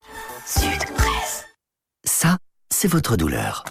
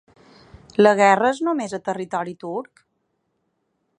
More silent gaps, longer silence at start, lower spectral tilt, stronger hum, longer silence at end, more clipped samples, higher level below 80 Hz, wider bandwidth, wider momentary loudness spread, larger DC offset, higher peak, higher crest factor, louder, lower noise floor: neither; second, 0.1 s vs 0.8 s; about the same, -4 dB/octave vs -5 dB/octave; neither; second, 0 s vs 1.35 s; neither; first, -32 dBFS vs -62 dBFS; first, 16.5 kHz vs 10 kHz; second, 9 LU vs 16 LU; neither; about the same, -4 dBFS vs -2 dBFS; about the same, 18 dB vs 22 dB; about the same, -21 LUFS vs -20 LUFS; first, -78 dBFS vs -72 dBFS